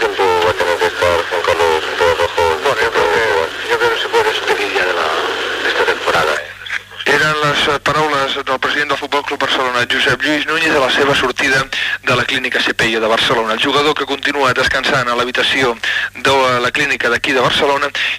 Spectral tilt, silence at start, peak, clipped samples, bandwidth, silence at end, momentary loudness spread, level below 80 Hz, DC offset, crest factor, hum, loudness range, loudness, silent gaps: -3 dB/octave; 0 s; -2 dBFS; under 0.1%; 16 kHz; 0 s; 4 LU; -44 dBFS; under 0.1%; 14 dB; none; 1 LU; -14 LUFS; none